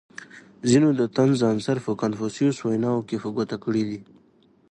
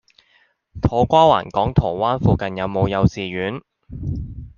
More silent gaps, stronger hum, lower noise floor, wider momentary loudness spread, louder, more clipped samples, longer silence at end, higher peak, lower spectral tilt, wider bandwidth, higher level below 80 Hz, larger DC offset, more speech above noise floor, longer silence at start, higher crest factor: neither; neither; about the same, -59 dBFS vs -60 dBFS; second, 10 LU vs 15 LU; second, -23 LUFS vs -19 LUFS; neither; first, 0.7 s vs 0.1 s; second, -6 dBFS vs -2 dBFS; about the same, -6.5 dB/octave vs -7.5 dB/octave; first, 10.5 kHz vs 7.2 kHz; second, -62 dBFS vs -36 dBFS; neither; second, 36 dB vs 42 dB; second, 0.2 s vs 0.75 s; about the same, 18 dB vs 18 dB